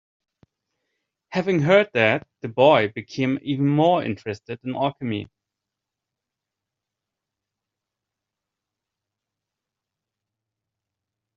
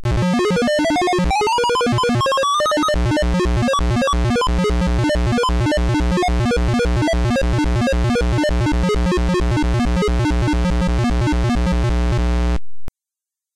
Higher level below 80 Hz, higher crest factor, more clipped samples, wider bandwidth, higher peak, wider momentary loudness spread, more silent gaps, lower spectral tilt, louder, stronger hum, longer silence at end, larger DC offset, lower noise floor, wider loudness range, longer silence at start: second, -66 dBFS vs -22 dBFS; first, 22 dB vs 4 dB; neither; second, 7.4 kHz vs 12.5 kHz; first, -4 dBFS vs -14 dBFS; first, 14 LU vs 2 LU; neither; second, -4.5 dB/octave vs -6 dB/octave; second, -21 LUFS vs -18 LUFS; neither; first, 6.1 s vs 0.65 s; neither; about the same, -86 dBFS vs -87 dBFS; first, 13 LU vs 2 LU; first, 1.3 s vs 0 s